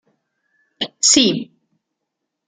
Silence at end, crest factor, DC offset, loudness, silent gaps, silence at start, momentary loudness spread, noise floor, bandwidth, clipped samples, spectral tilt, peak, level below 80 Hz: 1.05 s; 20 dB; under 0.1%; -15 LUFS; none; 0.8 s; 17 LU; -79 dBFS; 11 kHz; under 0.1%; -1.5 dB/octave; -2 dBFS; -62 dBFS